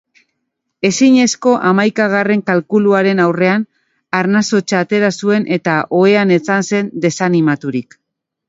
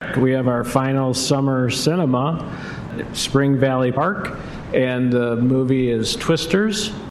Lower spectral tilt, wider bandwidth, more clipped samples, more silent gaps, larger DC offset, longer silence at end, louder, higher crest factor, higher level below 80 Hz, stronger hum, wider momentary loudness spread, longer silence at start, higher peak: about the same, -5.5 dB/octave vs -5.5 dB/octave; second, 8 kHz vs 13 kHz; neither; neither; neither; first, 0.65 s vs 0 s; first, -13 LUFS vs -19 LUFS; about the same, 14 dB vs 18 dB; second, -60 dBFS vs -44 dBFS; neither; second, 7 LU vs 10 LU; first, 0.85 s vs 0 s; about the same, 0 dBFS vs 0 dBFS